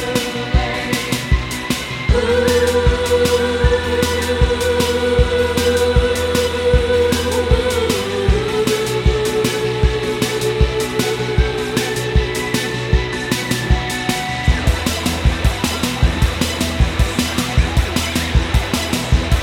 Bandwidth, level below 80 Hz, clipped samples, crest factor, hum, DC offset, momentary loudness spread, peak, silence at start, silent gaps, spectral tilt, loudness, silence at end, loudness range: 17 kHz; -22 dBFS; under 0.1%; 16 dB; none; under 0.1%; 4 LU; 0 dBFS; 0 s; none; -4.5 dB/octave; -17 LUFS; 0 s; 3 LU